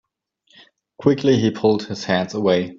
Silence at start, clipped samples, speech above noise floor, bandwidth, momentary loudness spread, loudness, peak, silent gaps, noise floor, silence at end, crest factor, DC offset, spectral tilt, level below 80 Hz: 1 s; under 0.1%; 45 dB; 7.6 kHz; 5 LU; -19 LUFS; -2 dBFS; none; -64 dBFS; 0 s; 18 dB; under 0.1%; -6.5 dB/octave; -58 dBFS